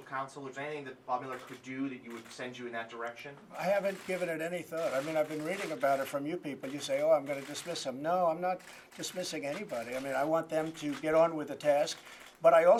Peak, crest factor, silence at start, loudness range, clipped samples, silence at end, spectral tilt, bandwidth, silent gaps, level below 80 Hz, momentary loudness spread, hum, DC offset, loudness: -12 dBFS; 20 dB; 0 s; 5 LU; under 0.1%; 0 s; -4.5 dB/octave; 15.5 kHz; none; -76 dBFS; 14 LU; none; under 0.1%; -34 LUFS